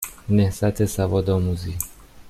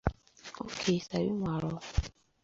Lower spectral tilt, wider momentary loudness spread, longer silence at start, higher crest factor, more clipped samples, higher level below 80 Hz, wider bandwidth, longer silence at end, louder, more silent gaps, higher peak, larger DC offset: about the same, -6.5 dB/octave vs -5.5 dB/octave; second, 9 LU vs 15 LU; about the same, 0 s vs 0.05 s; second, 16 dB vs 24 dB; neither; about the same, -42 dBFS vs -42 dBFS; first, 15.5 kHz vs 7.8 kHz; second, 0 s vs 0.35 s; first, -23 LUFS vs -34 LUFS; neither; first, -6 dBFS vs -10 dBFS; neither